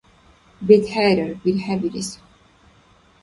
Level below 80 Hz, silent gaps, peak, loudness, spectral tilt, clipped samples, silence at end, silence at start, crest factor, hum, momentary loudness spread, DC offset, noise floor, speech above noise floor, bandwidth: -54 dBFS; none; 0 dBFS; -19 LUFS; -5.5 dB/octave; under 0.1%; 1.1 s; 0.6 s; 20 dB; none; 14 LU; under 0.1%; -54 dBFS; 36 dB; 11.5 kHz